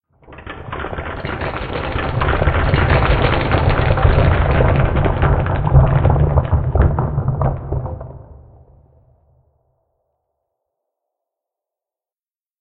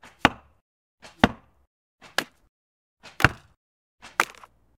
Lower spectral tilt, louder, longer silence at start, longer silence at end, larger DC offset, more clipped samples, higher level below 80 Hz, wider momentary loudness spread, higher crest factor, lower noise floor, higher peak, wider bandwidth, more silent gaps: first, -10.5 dB/octave vs -4 dB/octave; first, -17 LUFS vs -25 LUFS; about the same, 0.3 s vs 0.25 s; first, 4.25 s vs 0.55 s; neither; neither; first, -24 dBFS vs -48 dBFS; second, 12 LU vs 18 LU; second, 18 dB vs 30 dB; first, under -90 dBFS vs -51 dBFS; about the same, 0 dBFS vs 0 dBFS; second, 4.7 kHz vs 17.5 kHz; second, none vs 0.61-0.98 s, 1.67-1.98 s, 2.49-2.97 s, 3.57-3.98 s